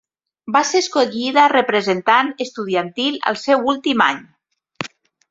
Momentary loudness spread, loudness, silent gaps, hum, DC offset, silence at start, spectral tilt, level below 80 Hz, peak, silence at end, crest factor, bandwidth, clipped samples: 16 LU; -17 LUFS; none; none; under 0.1%; 0.45 s; -3 dB/octave; -64 dBFS; -2 dBFS; 0.45 s; 18 dB; 7.8 kHz; under 0.1%